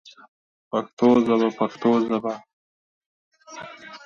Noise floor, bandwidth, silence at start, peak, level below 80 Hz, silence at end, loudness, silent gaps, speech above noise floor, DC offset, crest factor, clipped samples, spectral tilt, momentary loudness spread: -41 dBFS; 7 kHz; 0.75 s; -6 dBFS; -66 dBFS; 0.1 s; -22 LUFS; 0.93-0.97 s, 2.53-3.32 s; 20 dB; under 0.1%; 18 dB; under 0.1%; -6.5 dB/octave; 21 LU